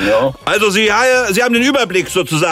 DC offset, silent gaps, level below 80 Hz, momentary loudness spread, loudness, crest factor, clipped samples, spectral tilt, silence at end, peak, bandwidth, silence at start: under 0.1%; none; -44 dBFS; 4 LU; -13 LUFS; 12 dB; under 0.1%; -3.5 dB/octave; 0 s; -2 dBFS; 16 kHz; 0 s